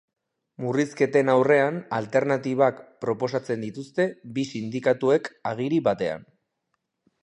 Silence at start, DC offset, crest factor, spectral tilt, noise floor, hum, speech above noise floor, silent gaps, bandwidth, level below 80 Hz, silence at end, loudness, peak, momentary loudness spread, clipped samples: 0.6 s; under 0.1%; 18 dB; -6.5 dB/octave; -78 dBFS; none; 54 dB; none; 10.5 kHz; -68 dBFS; 1 s; -24 LUFS; -6 dBFS; 11 LU; under 0.1%